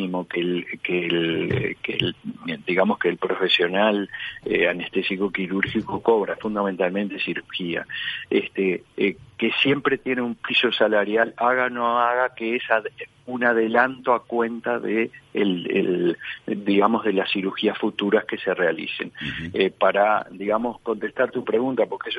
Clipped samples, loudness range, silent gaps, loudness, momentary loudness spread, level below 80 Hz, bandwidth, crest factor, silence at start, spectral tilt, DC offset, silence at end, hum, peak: under 0.1%; 3 LU; none; -23 LUFS; 8 LU; -60 dBFS; 11.5 kHz; 20 dB; 0 s; -7 dB/octave; under 0.1%; 0 s; none; -2 dBFS